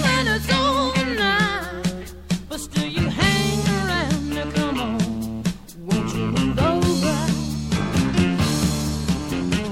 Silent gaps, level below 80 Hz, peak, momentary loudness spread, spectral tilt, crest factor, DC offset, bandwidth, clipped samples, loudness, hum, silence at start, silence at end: none; -36 dBFS; -6 dBFS; 8 LU; -5 dB/octave; 16 dB; 0.4%; 16 kHz; under 0.1%; -22 LUFS; none; 0 s; 0 s